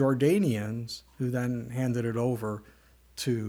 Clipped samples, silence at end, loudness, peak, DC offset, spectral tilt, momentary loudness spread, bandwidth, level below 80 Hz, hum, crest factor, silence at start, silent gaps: under 0.1%; 0 s; -30 LUFS; -12 dBFS; under 0.1%; -6.5 dB/octave; 13 LU; 19.5 kHz; -62 dBFS; none; 16 dB; 0 s; none